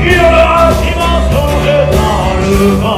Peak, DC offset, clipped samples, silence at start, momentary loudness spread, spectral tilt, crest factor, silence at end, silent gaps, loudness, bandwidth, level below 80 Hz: 0 dBFS; under 0.1%; 0.4%; 0 s; 5 LU; -6 dB/octave; 8 dB; 0 s; none; -9 LUFS; 15.5 kHz; -16 dBFS